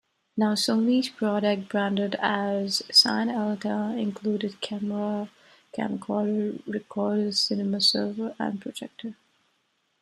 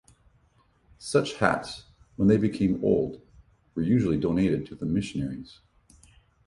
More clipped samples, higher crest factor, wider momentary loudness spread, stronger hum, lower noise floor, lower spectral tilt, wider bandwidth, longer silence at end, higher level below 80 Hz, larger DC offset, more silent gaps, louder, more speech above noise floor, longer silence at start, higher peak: neither; about the same, 22 dB vs 24 dB; second, 12 LU vs 18 LU; neither; first, -72 dBFS vs -64 dBFS; second, -4 dB/octave vs -7 dB/octave; first, 13.5 kHz vs 11.5 kHz; about the same, 0.9 s vs 0.95 s; second, -74 dBFS vs -50 dBFS; neither; neither; about the same, -25 LUFS vs -26 LUFS; first, 46 dB vs 39 dB; second, 0.35 s vs 1 s; about the same, -6 dBFS vs -4 dBFS